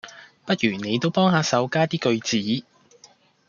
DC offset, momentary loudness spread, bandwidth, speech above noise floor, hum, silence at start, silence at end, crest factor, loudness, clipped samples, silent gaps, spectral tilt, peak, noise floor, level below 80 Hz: under 0.1%; 9 LU; 7.4 kHz; 33 dB; none; 0.05 s; 0.85 s; 18 dB; -22 LUFS; under 0.1%; none; -5 dB/octave; -6 dBFS; -55 dBFS; -66 dBFS